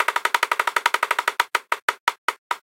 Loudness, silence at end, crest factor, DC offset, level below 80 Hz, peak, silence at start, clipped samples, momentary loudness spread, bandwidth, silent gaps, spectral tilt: -22 LUFS; 0.15 s; 22 dB; under 0.1%; -84 dBFS; -2 dBFS; 0 s; under 0.1%; 6 LU; 17 kHz; 1.82-1.88 s, 2.00-2.07 s, 2.18-2.28 s, 2.38-2.50 s; 2 dB/octave